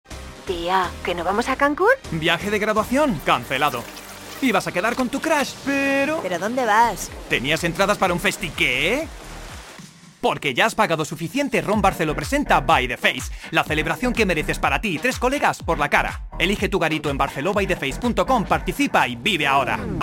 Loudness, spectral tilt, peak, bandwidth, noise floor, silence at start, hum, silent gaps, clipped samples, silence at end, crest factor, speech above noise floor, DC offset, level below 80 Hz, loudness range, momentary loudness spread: -21 LUFS; -4 dB/octave; -2 dBFS; 17 kHz; -43 dBFS; 0.1 s; none; none; under 0.1%; 0 s; 20 dB; 22 dB; under 0.1%; -38 dBFS; 2 LU; 7 LU